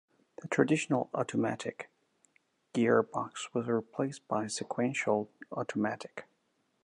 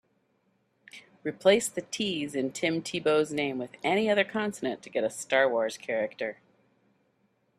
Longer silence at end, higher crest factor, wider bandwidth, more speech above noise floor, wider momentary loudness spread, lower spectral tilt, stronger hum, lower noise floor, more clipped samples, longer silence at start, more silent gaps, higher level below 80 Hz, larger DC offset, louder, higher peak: second, 0.6 s vs 1.25 s; about the same, 22 dB vs 22 dB; second, 11 kHz vs 14 kHz; about the same, 44 dB vs 44 dB; first, 13 LU vs 9 LU; first, -5.5 dB/octave vs -3.5 dB/octave; neither; first, -76 dBFS vs -72 dBFS; neither; second, 0.4 s vs 0.95 s; neither; second, -78 dBFS vs -72 dBFS; neither; second, -33 LUFS vs -28 LUFS; second, -12 dBFS vs -8 dBFS